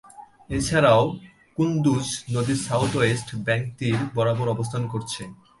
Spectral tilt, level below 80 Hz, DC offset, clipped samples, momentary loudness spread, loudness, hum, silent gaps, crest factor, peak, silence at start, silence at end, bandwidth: -5.5 dB/octave; -48 dBFS; under 0.1%; under 0.1%; 12 LU; -23 LUFS; none; none; 18 dB; -6 dBFS; 0.15 s; 0.25 s; 11.5 kHz